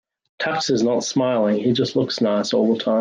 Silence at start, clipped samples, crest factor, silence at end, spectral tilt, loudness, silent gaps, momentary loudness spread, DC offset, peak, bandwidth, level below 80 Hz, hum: 0.4 s; under 0.1%; 12 dB; 0 s; -5 dB/octave; -20 LUFS; none; 3 LU; under 0.1%; -8 dBFS; 9.6 kHz; -64 dBFS; none